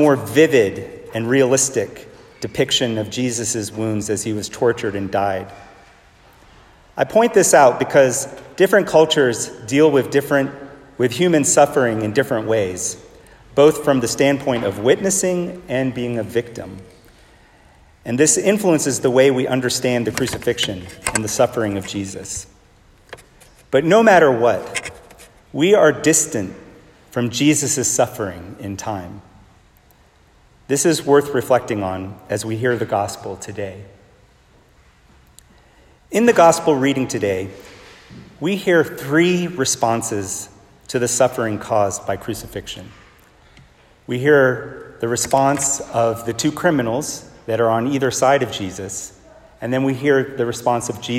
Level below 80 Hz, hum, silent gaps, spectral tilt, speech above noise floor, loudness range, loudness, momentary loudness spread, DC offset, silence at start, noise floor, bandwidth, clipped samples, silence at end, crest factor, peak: -52 dBFS; none; none; -4 dB/octave; 35 dB; 7 LU; -18 LUFS; 15 LU; under 0.1%; 0 s; -52 dBFS; 16.5 kHz; under 0.1%; 0 s; 18 dB; 0 dBFS